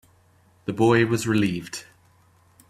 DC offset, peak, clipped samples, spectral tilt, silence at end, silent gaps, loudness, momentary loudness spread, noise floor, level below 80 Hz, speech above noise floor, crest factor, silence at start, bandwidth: under 0.1%; -6 dBFS; under 0.1%; -6 dB/octave; 0.9 s; none; -22 LUFS; 17 LU; -59 dBFS; -58 dBFS; 37 dB; 18 dB; 0.65 s; 14.5 kHz